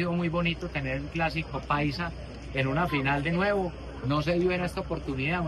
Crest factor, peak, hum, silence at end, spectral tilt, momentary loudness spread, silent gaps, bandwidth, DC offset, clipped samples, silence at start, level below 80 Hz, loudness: 16 dB; -12 dBFS; none; 0 s; -7 dB/octave; 8 LU; none; 12.5 kHz; under 0.1%; under 0.1%; 0 s; -42 dBFS; -29 LUFS